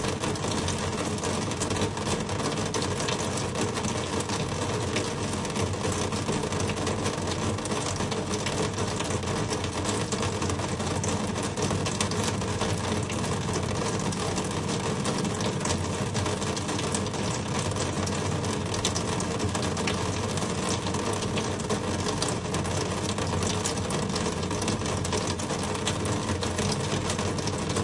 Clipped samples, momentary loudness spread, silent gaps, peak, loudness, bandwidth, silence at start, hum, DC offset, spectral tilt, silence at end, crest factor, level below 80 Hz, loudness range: under 0.1%; 2 LU; none; -10 dBFS; -28 LUFS; 11.5 kHz; 0 s; none; under 0.1%; -4 dB/octave; 0 s; 20 dB; -48 dBFS; 1 LU